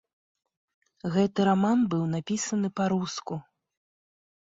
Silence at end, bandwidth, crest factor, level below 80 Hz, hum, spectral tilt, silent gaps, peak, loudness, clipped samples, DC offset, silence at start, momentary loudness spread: 1.05 s; 7.8 kHz; 18 dB; -66 dBFS; none; -6 dB/octave; none; -12 dBFS; -27 LUFS; under 0.1%; under 0.1%; 1.05 s; 13 LU